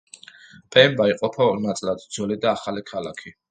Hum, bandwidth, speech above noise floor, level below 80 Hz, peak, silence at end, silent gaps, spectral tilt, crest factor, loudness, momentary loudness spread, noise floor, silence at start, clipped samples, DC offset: none; 9.4 kHz; 26 dB; -62 dBFS; 0 dBFS; 0.2 s; none; -4.5 dB/octave; 22 dB; -21 LUFS; 15 LU; -47 dBFS; 0.7 s; under 0.1%; under 0.1%